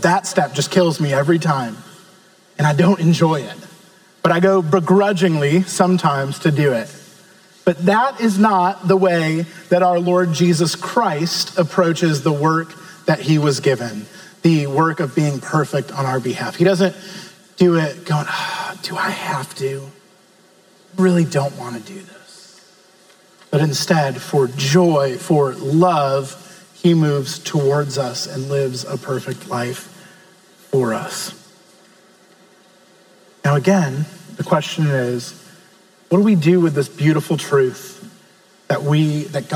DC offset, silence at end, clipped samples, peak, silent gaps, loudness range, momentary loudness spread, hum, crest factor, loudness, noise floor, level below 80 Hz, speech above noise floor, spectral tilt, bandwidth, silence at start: under 0.1%; 0 s; under 0.1%; 0 dBFS; none; 7 LU; 12 LU; none; 18 dB; -17 LUFS; -51 dBFS; -68 dBFS; 34 dB; -6 dB/octave; 19.5 kHz; 0 s